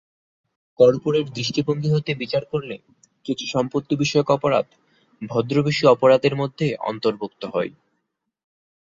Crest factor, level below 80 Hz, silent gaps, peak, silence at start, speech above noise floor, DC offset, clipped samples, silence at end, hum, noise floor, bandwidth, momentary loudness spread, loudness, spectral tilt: 20 dB; -60 dBFS; none; -2 dBFS; 0.8 s; 56 dB; under 0.1%; under 0.1%; 1.3 s; none; -76 dBFS; 7.8 kHz; 13 LU; -21 LUFS; -6 dB/octave